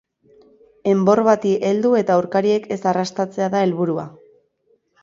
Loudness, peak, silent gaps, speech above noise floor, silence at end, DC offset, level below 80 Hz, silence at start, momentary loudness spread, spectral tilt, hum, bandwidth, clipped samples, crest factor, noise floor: -19 LUFS; -2 dBFS; none; 45 dB; 0.95 s; under 0.1%; -64 dBFS; 0.85 s; 8 LU; -6.5 dB/octave; none; 7.6 kHz; under 0.1%; 18 dB; -63 dBFS